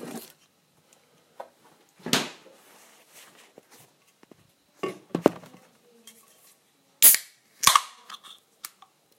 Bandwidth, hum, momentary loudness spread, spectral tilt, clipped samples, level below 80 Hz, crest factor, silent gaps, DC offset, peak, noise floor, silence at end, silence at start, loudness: 16 kHz; none; 28 LU; -1 dB/octave; under 0.1%; -66 dBFS; 30 dB; none; under 0.1%; 0 dBFS; -64 dBFS; 1.05 s; 0 s; -21 LUFS